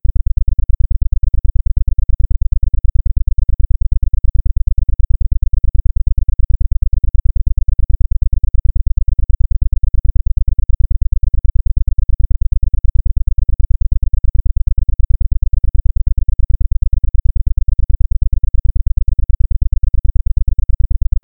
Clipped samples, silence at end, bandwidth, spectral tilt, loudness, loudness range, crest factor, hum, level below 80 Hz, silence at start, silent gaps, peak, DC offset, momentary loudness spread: under 0.1%; 0.3 s; 0.4 kHz; -16 dB/octave; -19 LUFS; 0 LU; 10 dB; none; -12 dBFS; 0.05 s; none; 0 dBFS; under 0.1%; 1 LU